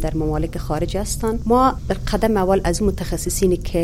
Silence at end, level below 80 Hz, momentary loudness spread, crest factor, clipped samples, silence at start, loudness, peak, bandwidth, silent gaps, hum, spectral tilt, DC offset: 0 s; -28 dBFS; 8 LU; 16 dB; under 0.1%; 0 s; -20 LUFS; -4 dBFS; 16.5 kHz; none; none; -5.5 dB/octave; under 0.1%